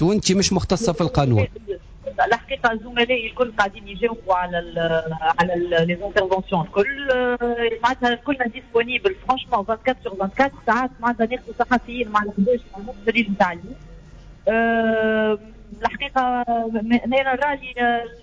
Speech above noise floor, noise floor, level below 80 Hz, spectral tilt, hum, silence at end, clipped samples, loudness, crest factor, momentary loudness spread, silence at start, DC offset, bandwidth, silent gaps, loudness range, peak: 22 dB; -42 dBFS; -42 dBFS; -5 dB/octave; none; 0 s; under 0.1%; -21 LUFS; 16 dB; 6 LU; 0 s; under 0.1%; 8 kHz; none; 1 LU; -6 dBFS